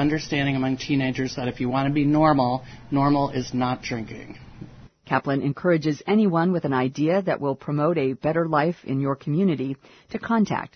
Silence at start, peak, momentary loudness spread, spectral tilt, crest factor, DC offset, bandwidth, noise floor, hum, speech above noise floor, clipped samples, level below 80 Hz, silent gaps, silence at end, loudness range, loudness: 0 s; -6 dBFS; 11 LU; -7 dB/octave; 18 dB; under 0.1%; 6.6 kHz; -43 dBFS; none; 20 dB; under 0.1%; -52 dBFS; none; 0.1 s; 3 LU; -23 LUFS